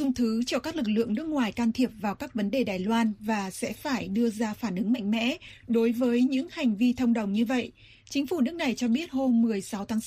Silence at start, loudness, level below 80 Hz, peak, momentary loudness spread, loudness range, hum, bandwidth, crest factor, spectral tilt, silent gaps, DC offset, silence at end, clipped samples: 0 s; -28 LUFS; -58 dBFS; -14 dBFS; 7 LU; 2 LU; none; 15 kHz; 14 dB; -5.5 dB/octave; none; under 0.1%; 0 s; under 0.1%